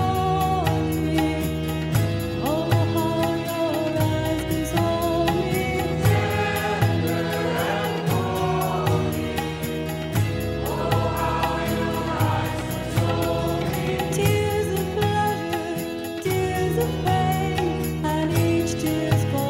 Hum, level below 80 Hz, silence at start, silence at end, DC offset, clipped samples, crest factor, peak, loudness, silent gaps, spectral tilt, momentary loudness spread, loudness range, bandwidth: none; -38 dBFS; 0 s; 0 s; under 0.1%; under 0.1%; 16 dB; -6 dBFS; -23 LUFS; none; -6 dB/octave; 4 LU; 2 LU; 16.5 kHz